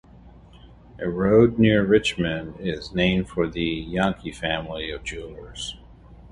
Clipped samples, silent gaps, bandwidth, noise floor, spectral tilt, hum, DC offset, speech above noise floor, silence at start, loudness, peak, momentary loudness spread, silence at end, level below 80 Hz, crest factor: under 0.1%; none; 11.5 kHz; -48 dBFS; -6 dB/octave; none; under 0.1%; 25 dB; 0.25 s; -23 LUFS; -4 dBFS; 16 LU; 0.05 s; -42 dBFS; 20 dB